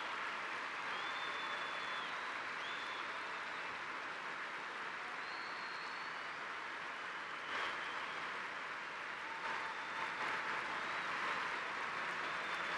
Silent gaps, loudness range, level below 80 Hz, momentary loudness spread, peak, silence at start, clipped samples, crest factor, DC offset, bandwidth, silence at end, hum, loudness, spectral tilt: none; 3 LU; -82 dBFS; 5 LU; -26 dBFS; 0 s; under 0.1%; 16 dB; under 0.1%; 13 kHz; 0 s; none; -42 LUFS; -1.5 dB/octave